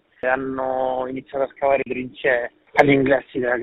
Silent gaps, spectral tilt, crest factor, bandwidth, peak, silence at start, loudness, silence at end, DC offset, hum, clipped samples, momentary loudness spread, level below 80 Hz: none; -4.5 dB/octave; 20 dB; 5.6 kHz; 0 dBFS; 0.25 s; -21 LUFS; 0 s; under 0.1%; none; under 0.1%; 10 LU; -54 dBFS